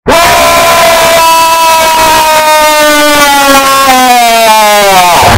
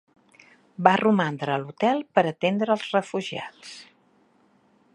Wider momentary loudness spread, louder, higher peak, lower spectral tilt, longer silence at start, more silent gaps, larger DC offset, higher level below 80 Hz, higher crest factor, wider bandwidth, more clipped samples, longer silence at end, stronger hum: second, 1 LU vs 20 LU; first, -3 LUFS vs -24 LUFS; about the same, 0 dBFS vs 0 dBFS; second, -2 dB/octave vs -6 dB/octave; second, 0.05 s vs 0.8 s; neither; neither; first, -30 dBFS vs -74 dBFS; second, 4 dB vs 24 dB; first, over 20 kHz vs 11 kHz; first, 2% vs under 0.1%; second, 0 s vs 1.1 s; neither